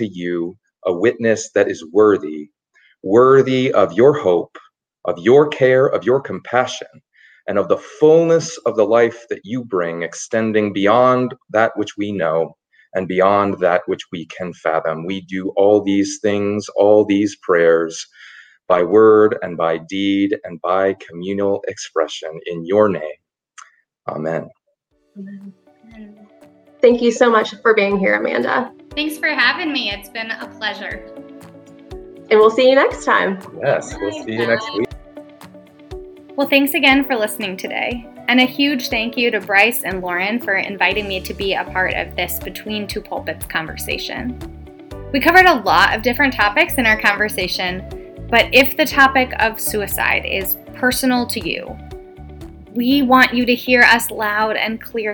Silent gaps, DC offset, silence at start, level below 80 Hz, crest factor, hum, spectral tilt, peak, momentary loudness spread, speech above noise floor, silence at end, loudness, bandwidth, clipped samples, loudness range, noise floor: none; under 0.1%; 0 s; -44 dBFS; 18 dB; none; -4 dB/octave; 0 dBFS; 15 LU; 49 dB; 0 s; -16 LUFS; over 20 kHz; under 0.1%; 7 LU; -65 dBFS